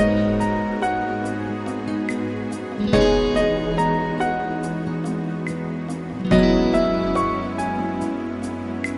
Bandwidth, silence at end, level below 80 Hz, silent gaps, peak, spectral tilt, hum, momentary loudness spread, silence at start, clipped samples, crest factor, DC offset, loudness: 11.5 kHz; 0 s; -36 dBFS; none; -2 dBFS; -6.5 dB/octave; none; 10 LU; 0 s; under 0.1%; 20 dB; under 0.1%; -22 LUFS